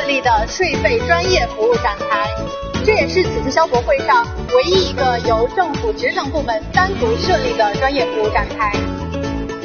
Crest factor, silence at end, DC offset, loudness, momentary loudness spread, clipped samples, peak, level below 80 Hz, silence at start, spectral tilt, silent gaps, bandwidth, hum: 16 dB; 0 s; under 0.1%; -16 LUFS; 6 LU; under 0.1%; 0 dBFS; -30 dBFS; 0 s; -3 dB/octave; none; 6.8 kHz; none